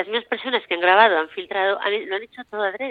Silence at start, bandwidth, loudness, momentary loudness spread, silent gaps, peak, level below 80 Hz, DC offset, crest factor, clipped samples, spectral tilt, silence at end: 0 s; 4.9 kHz; -20 LUFS; 13 LU; none; -2 dBFS; -70 dBFS; under 0.1%; 20 dB; under 0.1%; -5 dB/octave; 0 s